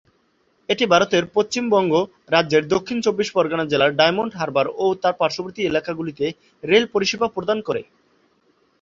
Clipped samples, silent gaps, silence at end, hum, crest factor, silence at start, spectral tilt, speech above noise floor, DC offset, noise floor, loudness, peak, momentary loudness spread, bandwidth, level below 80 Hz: under 0.1%; none; 1 s; none; 20 dB; 0.7 s; -4.5 dB/octave; 44 dB; under 0.1%; -63 dBFS; -20 LUFS; -2 dBFS; 9 LU; 7.6 kHz; -60 dBFS